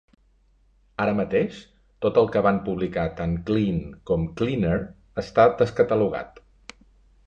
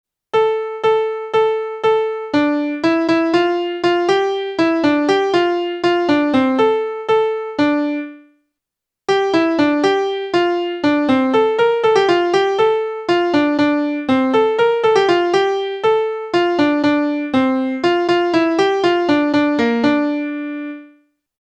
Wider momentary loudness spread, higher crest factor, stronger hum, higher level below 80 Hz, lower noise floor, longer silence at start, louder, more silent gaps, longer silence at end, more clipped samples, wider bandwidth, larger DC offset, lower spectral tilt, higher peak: first, 13 LU vs 5 LU; first, 20 dB vs 14 dB; neither; first, -46 dBFS vs -58 dBFS; second, -61 dBFS vs -83 dBFS; first, 1 s vs 0.35 s; second, -24 LUFS vs -16 LUFS; neither; first, 1 s vs 0.55 s; neither; about the same, 8 kHz vs 8.8 kHz; neither; first, -8 dB/octave vs -5 dB/octave; about the same, -4 dBFS vs -2 dBFS